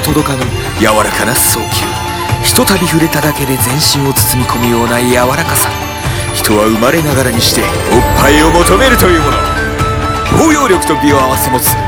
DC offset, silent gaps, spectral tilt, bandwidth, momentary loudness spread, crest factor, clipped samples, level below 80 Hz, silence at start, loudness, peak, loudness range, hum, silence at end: under 0.1%; none; -4 dB/octave; 18.5 kHz; 7 LU; 10 dB; 0.5%; -24 dBFS; 0 s; -10 LUFS; 0 dBFS; 2 LU; none; 0 s